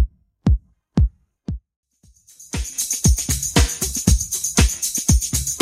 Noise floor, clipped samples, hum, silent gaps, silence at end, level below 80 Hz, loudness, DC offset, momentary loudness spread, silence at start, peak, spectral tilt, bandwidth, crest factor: -53 dBFS; under 0.1%; none; 1.76-1.83 s; 0 s; -24 dBFS; -20 LUFS; under 0.1%; 14 LU; 0 s; 0 dBFS; -3.5 dB/octave; 16.5 kHz; 20 dB